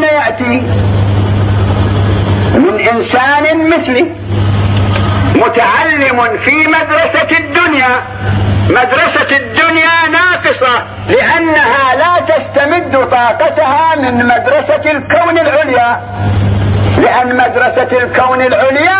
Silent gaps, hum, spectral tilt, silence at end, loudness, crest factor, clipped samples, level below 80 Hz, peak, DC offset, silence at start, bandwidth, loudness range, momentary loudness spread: none; none; -9.5 dB/octave; 0 s; -9 LUFS; 10 dB; under 0.1%; -26 dBFS; 0 dBFS; under 0.1%; 0 s; 4 kHz; 2 LU; 4 LU